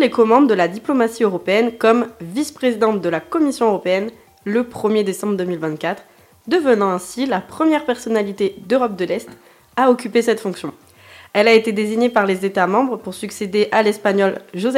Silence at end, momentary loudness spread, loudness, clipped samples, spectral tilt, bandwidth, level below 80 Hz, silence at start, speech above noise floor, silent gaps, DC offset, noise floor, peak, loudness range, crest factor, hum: 0 s; 10 LU; -18 LUFS; under 0.1%; -5 dB/octave; 16 kHz; -62 dBFS; 0 s; 27 dB; none; under 0.1%; -44 dBFS; 0 dBFS; 3 LU; 18 dB; none